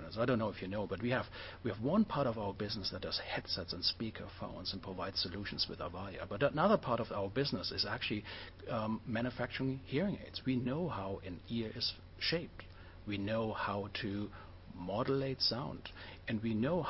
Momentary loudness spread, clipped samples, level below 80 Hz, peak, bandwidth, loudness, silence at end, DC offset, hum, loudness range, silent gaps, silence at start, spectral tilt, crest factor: 12 LU; under 0.1%; -58 dBFS; -18 dBFS; 5.8 kHz; -37 LUFS; 0 s; under 0.1%; none; 3 LU; none; 0 s; -8.5 dB/octave; 20 dB